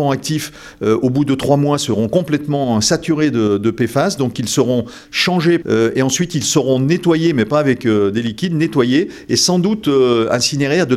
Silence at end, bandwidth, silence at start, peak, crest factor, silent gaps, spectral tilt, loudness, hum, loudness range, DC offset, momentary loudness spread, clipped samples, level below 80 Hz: 0 s; 15.5 kHz; 0 s; 0 dBFS; 14 dB; none; -5 dB/octave; -15 LUFS; none; 1 LU; under 0.1%; 4 LU; under 0.1%; -48 dBFS